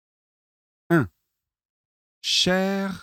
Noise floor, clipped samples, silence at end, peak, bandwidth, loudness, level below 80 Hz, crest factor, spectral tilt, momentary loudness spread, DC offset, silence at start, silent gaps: -81 dBFS; under 0.1%; 0 s; -8 dBFS; 16.5 kHz; -22 LUFS; -60 dBFS; 20 dB; -4 dB/octave; 11 LU; under 0.1%; 0.9 s; 1.65-2.21 s